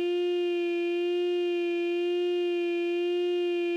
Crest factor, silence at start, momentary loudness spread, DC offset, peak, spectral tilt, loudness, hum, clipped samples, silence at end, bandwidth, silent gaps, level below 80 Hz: 6 dB; 0 s; 1 LU; under 0.1%; -22 dBFS; -3 dB/octave; -28 LUFS; none; under 0.1%; 0 s; 6.8 kHz; none; under -90 dBFS